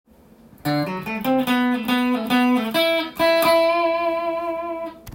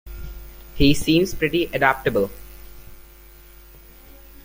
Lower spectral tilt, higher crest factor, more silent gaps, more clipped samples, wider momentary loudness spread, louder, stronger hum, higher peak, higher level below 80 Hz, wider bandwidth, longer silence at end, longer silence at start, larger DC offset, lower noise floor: about the same, -5 dB/octave vs -5 dB/octave; second, 14 dB vs 20 dB; neither; neither; second, 10 LU vs 23 LU; about the same, -20 LUFS vs -20 LUFS; neither; second, -6 dBFS vs -2 dBFS; second, -56 dBFS vs -36 dBFS; about the same, 17 kHz vs 16.5 kHz; second, 0 s vs 1.45 s; first, 0.65 s vs 0.05 s; neither; first, -49 dBFS vs -45 dBFS